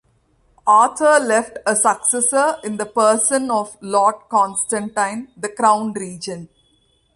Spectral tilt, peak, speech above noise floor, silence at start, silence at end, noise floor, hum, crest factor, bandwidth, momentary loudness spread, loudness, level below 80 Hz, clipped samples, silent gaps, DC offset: -2.5 dB/octave; -2 dBFS; 43 dB; 0.65 s; 0.7 s; -60 dBFS; none; 16 dB; 11.5 kHz; 14 LU; -17 LUFS; -62 dBFS; under 0.1%; none; under 0.1%